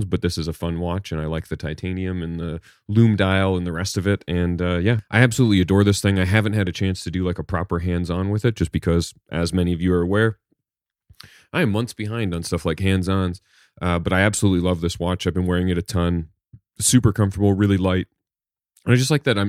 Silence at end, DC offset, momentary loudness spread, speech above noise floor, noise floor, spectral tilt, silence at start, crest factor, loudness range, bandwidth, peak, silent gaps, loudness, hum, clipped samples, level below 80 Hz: 0 s; under 0.1%; 10 LU; over 70 dB; under -90 dBFS; -5.5 dB/octave; 0 s; 20 dB; 5 LU; 15.5 kHz; 0 dBFS; none; -21 LUFS; none; under 0.1%; -40 dBFS